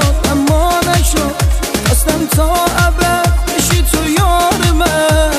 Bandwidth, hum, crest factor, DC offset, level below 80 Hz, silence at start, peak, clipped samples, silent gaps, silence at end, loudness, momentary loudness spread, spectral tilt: 15.5 kHz; none; 10 dB; under 0.1%; -16 dBFS; 0 s; 0 dBFS; under 0.1%; none; 0 s; -12 LUFS; 3 LU; -4.5 dB/octave